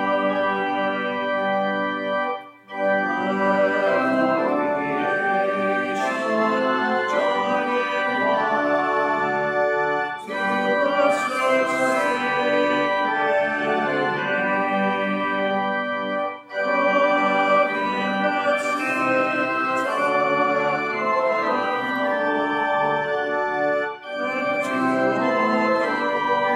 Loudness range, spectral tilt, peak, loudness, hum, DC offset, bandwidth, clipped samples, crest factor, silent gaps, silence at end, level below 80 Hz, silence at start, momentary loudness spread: 2 LU; -5 dB/octave; -6 dBFS; -21 LUFS; none; under 0.1%; 13 kHz; under 0.1%; 14 dB; none; 0 s; -70 dBFS; 0 s; 4 LU